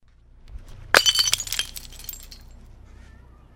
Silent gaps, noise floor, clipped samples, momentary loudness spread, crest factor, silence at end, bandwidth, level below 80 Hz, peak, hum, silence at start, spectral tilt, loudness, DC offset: none; -49 dBFS; under 0.1%; 20 LU; 26 dB; 1.2 s; 17 kHz; -44 dBFS; 0 dBFS; none; 0.5 s; 0.5 dB/octave; -19 LUFS; under 0.1%